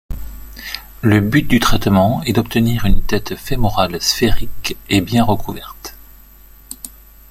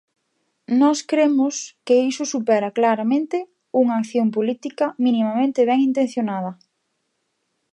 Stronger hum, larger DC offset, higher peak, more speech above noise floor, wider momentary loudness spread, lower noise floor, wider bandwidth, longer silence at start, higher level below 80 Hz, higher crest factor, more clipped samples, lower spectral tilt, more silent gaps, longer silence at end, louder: neither; neither; first, 0 dBFS vs -6 dBFS; second, 28 dB vs 54 dB; first, 18 LU vs 7 LU; second, -42 dBFS vs -73 dBFS; first, 16.5 kHz vs 11 kHz; second, 0.1 s vs 0.7 s; first, -26 dBFS vs -78 dBFS; about the same, 14 dB vs 16 dB; neither; about the same, -5 dB/octave vs -5 dB/octave; neither; second, 0.45 s vs 1.2 s; first, -16 LUFS vs -20 LUFS